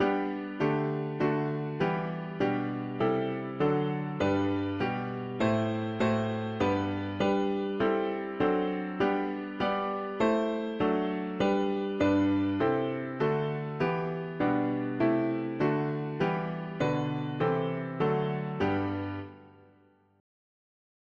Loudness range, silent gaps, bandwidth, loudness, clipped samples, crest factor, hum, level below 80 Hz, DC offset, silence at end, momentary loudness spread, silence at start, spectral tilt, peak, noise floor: 2 LU; none; 7.4 kHz; -30 LUFS; under 0.1%; 16 dB; none; -60 dBFS; under 0.1%; 1.7 s; 6 LU; 0 s; -8 dB/octave; -14 dBFS; -63 dBFS